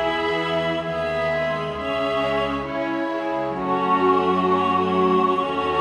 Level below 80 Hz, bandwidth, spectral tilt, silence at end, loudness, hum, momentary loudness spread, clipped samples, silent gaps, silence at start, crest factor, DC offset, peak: -50 dBFS; 10.5 kHz; -6.5 dB/octave; 0 s; -22 LUFS; none; 6 LU; under 0.1%; none; 0 s; 14 dB; under 0.1%; -8 dBFS